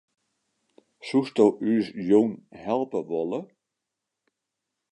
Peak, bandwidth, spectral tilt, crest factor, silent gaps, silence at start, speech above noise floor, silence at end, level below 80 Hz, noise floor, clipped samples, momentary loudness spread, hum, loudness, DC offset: -6 dBFS; 10.5 kHz; -7 dB/octave; 20 dB; none; 1.05 s; 61 dB; 1.5 s; -72 dBFS; -85 dBFS; under 0.1%; 12 LU; none; -25 LUFS; under 0.1%